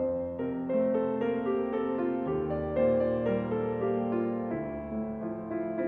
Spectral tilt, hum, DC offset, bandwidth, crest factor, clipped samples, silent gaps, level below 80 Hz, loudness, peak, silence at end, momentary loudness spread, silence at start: -10.5 dB/octave; none; under 0.1%; 4.2 kHz; 14 dB; under 0.1%; none; -54 dBFS; -31 LUFS; -16 dBFS; 0 s; 8 LU; 0 s